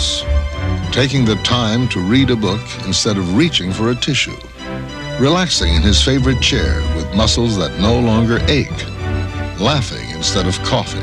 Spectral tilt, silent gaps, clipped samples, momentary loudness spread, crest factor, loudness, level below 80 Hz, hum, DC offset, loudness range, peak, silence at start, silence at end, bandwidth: -4.5 dB/octave; none; under 0.1%; 9 LU; 16 dB; -15 LUFS; -24 dBFS; none; under 0.1%; 2 LU; 0 dBFS; 0 s; 0 s; 11.5 kHz